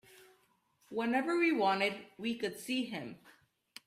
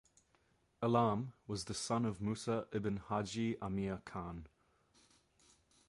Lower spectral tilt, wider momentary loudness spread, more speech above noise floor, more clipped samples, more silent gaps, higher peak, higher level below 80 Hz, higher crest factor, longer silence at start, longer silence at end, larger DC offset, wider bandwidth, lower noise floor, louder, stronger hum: second, -4.5 dB/octave vs -6 dB/octave; first, 14 LU vs 11 LU; about the same, 38 dB vs 37 dB; neither; neither; about the same, -18 dBFS vs -18 dBFS; second, -80 dBFS vs -64 dBFS; about the same, 18 dB vs 22 dB; second, 0.2 s vs 0.8 s; second, 0.55 s vs 1.4 s; neither; first, 15 kHz vs 11.5 kHz; about the same, -72 dBFS vs -75 dBFS; first, -34 LUFS vs -39 LUFS; neither